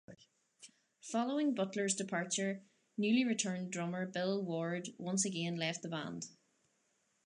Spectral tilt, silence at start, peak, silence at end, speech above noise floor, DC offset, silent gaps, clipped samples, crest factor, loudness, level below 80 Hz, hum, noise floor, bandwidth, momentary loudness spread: -4 dB/octave; 0.1 s; -20 dBFS; 0.95 s; 42 dB; under 0.1%; none; under 0.1%; 18 dB; -37 LUFS; -86 dBFS; none; -78 dBFS; 11 kHz; 10 LU